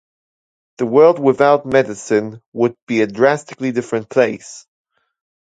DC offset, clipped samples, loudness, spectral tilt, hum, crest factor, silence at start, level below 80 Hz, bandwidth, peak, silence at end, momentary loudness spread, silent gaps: under 0.1%; under 0.1%; -16 LUFS; -6 dB/octave; none; 16 dB; 0.8 s; -62 dBFS; 9.2 kHz; 0 dBFS; 0.8 s; 10 LU; 2.46-2.52 s, 2.82-2.87 s